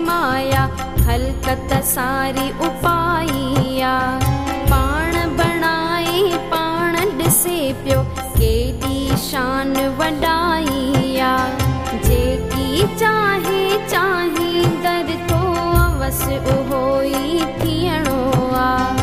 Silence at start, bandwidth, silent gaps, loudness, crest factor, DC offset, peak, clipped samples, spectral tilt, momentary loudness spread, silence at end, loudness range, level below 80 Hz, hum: 0 s; 15.5 kHz; none; -18 LUFS; 16 dB; under 0.1%; -2 dBFS; under 0.1%; -5 dB/octave; 3 LU; 0 s; 1 LU; -26 dBFS; none